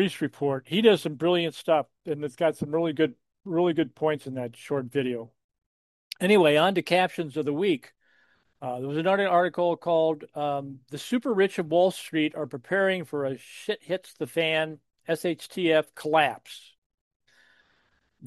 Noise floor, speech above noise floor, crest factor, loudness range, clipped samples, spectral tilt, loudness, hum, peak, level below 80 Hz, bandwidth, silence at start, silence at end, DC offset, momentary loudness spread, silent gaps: -69 dBFS; 43 dB; 20 dB; 4 LU; under 0.1%; -5.5 dB/octave; -26 LUFS; none; -6 dBFS; -74 dBFS; 12.5 kHz; 0 s; 0 s; under 0.1%; 12 LU; 5.44-5.49 s, 5.66-6.11 s, 16.78-16.90 s, 17.01-17.20 s